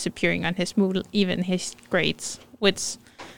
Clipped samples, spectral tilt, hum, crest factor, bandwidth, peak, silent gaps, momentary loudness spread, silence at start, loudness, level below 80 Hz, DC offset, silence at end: under 0.1%; -4 dB/octave; none; 20 dB; 17 kHz; -6 dBFS; none; 8 LU; 0 s; -25 LUFS; -56 dBFS; 0.6%; 0 s